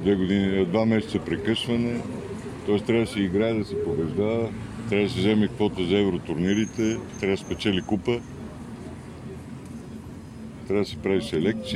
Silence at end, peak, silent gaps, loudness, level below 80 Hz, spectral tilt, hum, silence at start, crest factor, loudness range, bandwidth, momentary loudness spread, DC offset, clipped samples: 0 s; -8 dBFS; none; -25 LUFS; -50 dBFS; -6.5 dB/octave; none; 0 s; 18 dB; 7 LU; 12.5 kHz; 16 LU; under 0.1%; under 0.1%